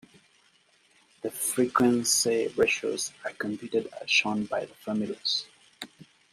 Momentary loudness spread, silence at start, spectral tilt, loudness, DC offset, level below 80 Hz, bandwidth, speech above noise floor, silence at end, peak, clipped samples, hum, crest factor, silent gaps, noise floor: 16 LU; 1.25 s; -2.5 dB/octave; -27 LUFS; under 0.1%; -68 dBFS; 15.5 kHz; 36 dB; 0.3 s; -10 dBFS; under 0.1%; none; 20 dB; none; -64 dBFS